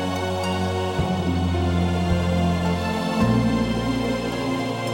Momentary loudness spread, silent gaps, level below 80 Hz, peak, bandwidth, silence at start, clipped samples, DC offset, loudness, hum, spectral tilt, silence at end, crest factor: 4 LU; none; -36 dBFS; -8 dBFS; 16.5 kHz; 0 s; under 0.1%; under 0.1%; -23 LUFS; none; -6.5 dB/octave; 0 s; 14 dB